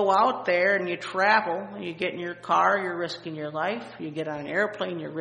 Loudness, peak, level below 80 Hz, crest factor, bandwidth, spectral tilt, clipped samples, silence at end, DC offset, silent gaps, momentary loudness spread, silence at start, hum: -26 LUFS; -6 dBFS; -72 dBFS; 20 dB; 10 kHz; -5 dB/octave; under 0.1%; 0 s; under 0.1%; none; 12 LU; 0 s; none